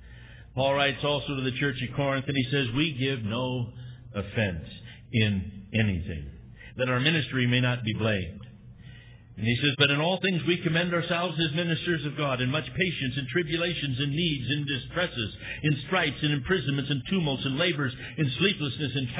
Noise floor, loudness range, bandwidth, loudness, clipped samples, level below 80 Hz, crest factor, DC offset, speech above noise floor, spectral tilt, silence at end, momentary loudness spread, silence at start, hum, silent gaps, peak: -48 dBFS; 4 LU; 4 kHz; -27 LUFS; under 0.1%; -50 dBFS; 20 dB; under 0.1%; 21 dB; -10 dB/octave; 0 s; 9 LU; 0 s; none; none; -8 dBFS